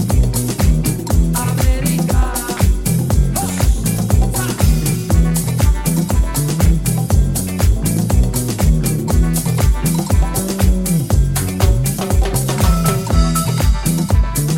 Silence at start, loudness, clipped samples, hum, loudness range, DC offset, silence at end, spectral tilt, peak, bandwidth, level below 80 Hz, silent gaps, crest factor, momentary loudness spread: 0 s; -16 LUFS; under 0.1%; none; 0 LU; under 0.1%; 0 s; -5.5 dB/octave; -2 dBFS; 17 kHz; -18 dBFS; none; 12 dB; 2 LU